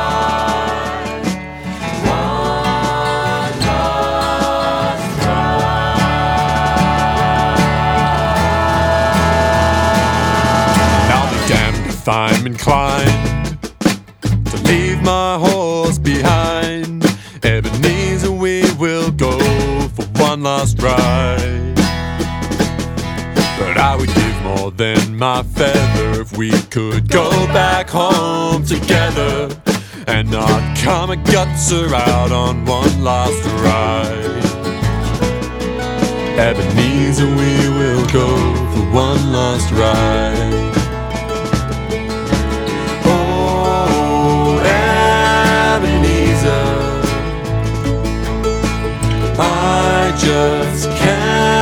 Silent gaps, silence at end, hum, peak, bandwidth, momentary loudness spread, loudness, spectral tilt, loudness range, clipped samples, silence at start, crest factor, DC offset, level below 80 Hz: none; 0 s; none; 0 dBFS; over 20 kHz; 6 LU; -15 LUFS; -5 dB/octave; 4 LU; under 0.1%; 0 s; 14 dB; under 0.1%; -26 dBFS